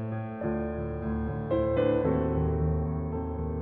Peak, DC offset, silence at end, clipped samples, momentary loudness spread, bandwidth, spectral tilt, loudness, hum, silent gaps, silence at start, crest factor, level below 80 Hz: -14 dBFS; under 0.1%; 0 s; under 0.1%; 7 LU; 4 kHz; -12 dB/octave; -30 LUFS; none; none; 0 s; 14 dB; -40 dBFS